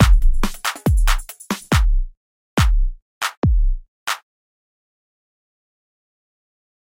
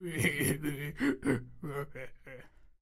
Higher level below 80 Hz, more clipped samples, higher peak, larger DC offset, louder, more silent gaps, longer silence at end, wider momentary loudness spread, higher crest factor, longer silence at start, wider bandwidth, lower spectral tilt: first, -20 dBFS vs -56 dBFS; neither; first, 0 dBFS vs -16 dBFS; neither; first, -22 LUFS vs -34 LUFS; first, 2.17-2.57 s, 3.02-3.21 s, 3.37-3.42 s, 3.88-4.06 s vs none; first, 2.7 s vs 0.15 s; second, 9 LU vs 21 LU; about the same, 18 dB vs 20 dB; about the same, 0 s vs 0 s; about the same, 16.5 kHz vs 16 kHz; about the same, -5 dB/octave vs -5 dB/octave